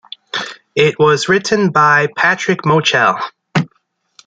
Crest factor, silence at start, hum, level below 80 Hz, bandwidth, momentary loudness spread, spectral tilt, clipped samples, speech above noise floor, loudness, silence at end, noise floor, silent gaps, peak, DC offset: 14 dB; 0.35 s; none; -56 dBFS; 9.2 kHz; 12 LU; -4.5 dB/octave; under 0.1%; 50 dB; -14 LUFS; 0.6 s; -62 dBFS; none; 0 dBFS; under 0.1%